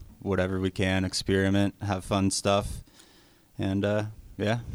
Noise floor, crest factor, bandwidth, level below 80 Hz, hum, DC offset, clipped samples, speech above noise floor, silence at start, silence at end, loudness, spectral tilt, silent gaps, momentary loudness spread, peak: -58 dBFS; 18 dB; over 20 kHz; -48 dBFS; none; under 0.1%; under 0.1%; 31 dB; 0 s; 0 s; -28 LUFS; -5 dB/octave; none; 10 LU; -10 dBFS